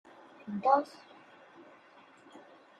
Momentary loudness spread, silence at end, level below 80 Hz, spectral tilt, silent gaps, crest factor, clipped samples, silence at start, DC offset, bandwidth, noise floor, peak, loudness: 27 LU; 0.4 s; -88 dBFS; -6.5 dB/octave; none; 24 dB; under 0.1%; 0.45 s; under 0.1%; 9.6 kHz; -59 dBFS; -12 dBFS; -30 LUFS